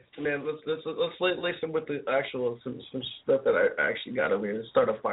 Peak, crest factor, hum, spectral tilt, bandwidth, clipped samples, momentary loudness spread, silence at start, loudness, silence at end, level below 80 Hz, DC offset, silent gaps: -10 dBFS; 20 dB; none; -2.5 dB/octave; 4 kHz; under 0.1%; 9 LU; 0.15 s; -29 LUFS; 0 s; -68 dBFS; under 0.1%; none